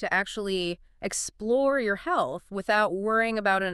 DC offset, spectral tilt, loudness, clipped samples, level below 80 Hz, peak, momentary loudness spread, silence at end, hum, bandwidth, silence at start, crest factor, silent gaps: under 0.1%; -3.5 dB/octave; -27 LUFS; under 0.1%; -56 dBFS; -12 dBFS; 8 LU; 0 s; none; 13.5 kHz; 0 s; 16 dB; none